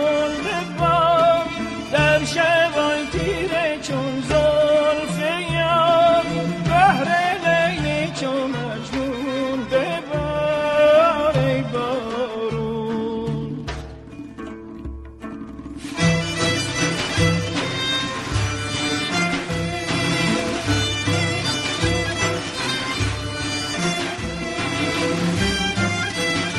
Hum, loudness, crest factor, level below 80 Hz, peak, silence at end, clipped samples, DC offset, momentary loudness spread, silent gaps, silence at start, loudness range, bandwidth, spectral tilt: none; -20 LUFS; 18 dB; -40 dBFS; -4 dBFS; 0 s; under 0.1%; under 0.1%; 10 LU; none; 0 s; 7 LU; 13 kHz; -4.5 dB/octave